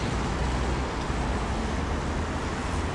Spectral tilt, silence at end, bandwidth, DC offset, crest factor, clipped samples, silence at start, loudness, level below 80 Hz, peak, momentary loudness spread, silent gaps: -5.5 dB/octave; 0 s; 11.5 kHz; under 0.1%; 14 dB; under 0.1%; 0 s; -29 LUFS; -32 dBFS; -14 dBFS; 2 LU; none